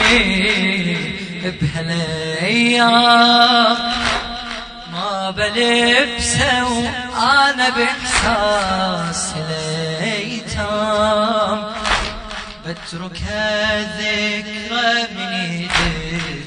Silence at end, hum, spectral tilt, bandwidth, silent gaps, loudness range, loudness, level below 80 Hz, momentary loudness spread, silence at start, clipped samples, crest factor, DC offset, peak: 0 s; none; -3.5 dB/octave; 10 kHz; none; 6 LU; -16 LUFS; -36 dBFS; 13 LU; 0 s; under 0.1%; 18 dB; under 0.1%; 0 dBFS